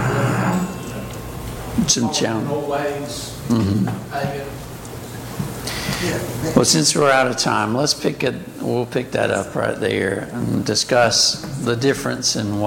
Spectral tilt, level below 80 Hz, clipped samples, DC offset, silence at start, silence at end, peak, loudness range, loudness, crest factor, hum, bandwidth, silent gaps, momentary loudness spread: -4 dB/octave; -42 dBFS; under 0.1%; under 0.1%; 0 s; 0 s; -2 dBFS; 6 LU; -19 LUFS; 20 dB; none; 17 kHz; none; 15 LU